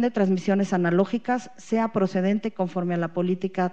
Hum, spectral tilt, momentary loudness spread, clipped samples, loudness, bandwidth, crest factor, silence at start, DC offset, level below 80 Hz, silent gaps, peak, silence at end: none; -7.5 dB/octave; 5 LU; under 0.1%; -25 LUFS; 8.2 kHz; 16 dB; 0 s; 0.5%; -78 dBFS; none; -8 dBFS; 0 s